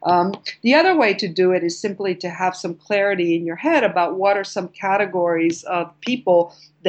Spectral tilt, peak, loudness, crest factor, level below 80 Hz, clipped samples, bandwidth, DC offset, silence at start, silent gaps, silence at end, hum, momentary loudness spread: -5 dB/octave; -2 dBFS; -19 LUFS; 16 dB; -72 dBFS; under 0.1%; 8.6 kHz; under 0.1%; 0 s; none; 0 s; none; 9 LU